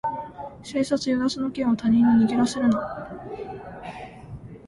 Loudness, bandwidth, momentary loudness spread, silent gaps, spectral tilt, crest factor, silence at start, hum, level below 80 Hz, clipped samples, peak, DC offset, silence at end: -23 LUFS; 11.5 kHz; 20 LU; none; -5.5 dB/octave; 14 dB; 0.05 s; none; -52 dBFS; under 0.1%; -10 dBFS; under 0.1%; 0 s